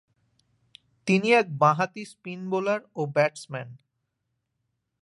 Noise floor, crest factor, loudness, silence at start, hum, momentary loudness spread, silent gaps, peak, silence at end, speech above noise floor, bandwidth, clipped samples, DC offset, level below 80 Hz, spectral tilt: -79 dBFS; 20 dB; -24 LUFS; 1.05 s; none; 17 LU; none; -8 dBFS; 1.25 s; 54 dB; 11.5 kHz; under 0.1%; under 0.1%; -76 dBFS; -6 dB/octave